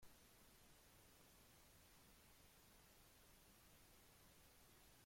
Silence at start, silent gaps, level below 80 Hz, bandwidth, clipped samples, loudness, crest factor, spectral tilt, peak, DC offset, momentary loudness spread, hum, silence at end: 0 s; none; -78 dBFS; 16.5 kHz; under 0.1%; -69 LUFS; 16 dB; -2.5 dB/octave; -54 dBFS; under 0.1%; 0 LU; none; 0 s